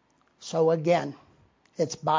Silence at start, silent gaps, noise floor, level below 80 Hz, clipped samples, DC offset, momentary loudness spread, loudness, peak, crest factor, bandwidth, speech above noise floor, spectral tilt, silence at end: 0.4 s; none; -61 dBFS; -72 dBFS; under 0.1%; under 0.1%; 19 LU; -26 LUFS; -12 dBFS; 16 dB; 7.6 kHz; 37 dB; -5.5 dB/octave; 0 s